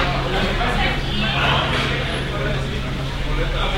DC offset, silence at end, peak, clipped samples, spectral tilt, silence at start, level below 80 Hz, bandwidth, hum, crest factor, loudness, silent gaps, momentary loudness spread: under 0.1%; 0 s; -6 dBFS; under 0.1%; -5 dB/octave; 0 s; -26 dBFS; 15.5 kHz; none; 14 dB; -21 LUFS; none; 7 LU